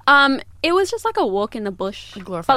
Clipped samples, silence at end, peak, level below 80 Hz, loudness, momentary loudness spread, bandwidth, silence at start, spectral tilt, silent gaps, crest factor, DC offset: under 0.1%; 0 s; -2 dBFS; -50 dBFS; -19 LUFS; 14 LU; 15 kHz; 0.05 s; -4 dB/octave; none; 18 dB; under 0.1%